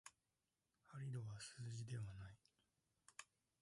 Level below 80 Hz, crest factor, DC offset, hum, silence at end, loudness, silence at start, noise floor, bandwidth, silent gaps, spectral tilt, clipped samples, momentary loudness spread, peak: -76 dBFS; 18 dB; under 0.1%; none; 0.4 s; -54 LUFS; 0.05 s; under -90 dBFS; 11.5 kHz; none; -5 dB/octave; under 0.1%; 11 LU; -38 dBFS